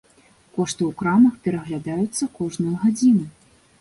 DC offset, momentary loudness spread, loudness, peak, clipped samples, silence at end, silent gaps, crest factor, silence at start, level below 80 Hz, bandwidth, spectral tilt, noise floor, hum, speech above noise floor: under 0.1%; 11 LU; -21 LUFS; -6 dBFS; under 0.1%; 0.5 s; none; 16 dB; 0.55 s; -58 dBFS; 11.5 kHz; -6 dB/octave; -55 dBFS; none; 35 dB